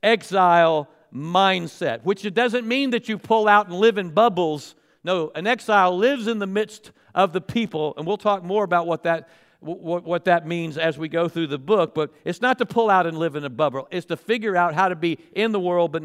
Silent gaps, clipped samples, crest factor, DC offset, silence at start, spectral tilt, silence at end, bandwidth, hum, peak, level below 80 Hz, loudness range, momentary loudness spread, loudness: none; under 0.1%; 18 dB; under 0.1%; 0.05 s; -5.5 dB/octave; 0 s; 14.5 kHz; none; -4 dBFS; -68 dBFS; 4 LU; 10 LU; -21 LUFS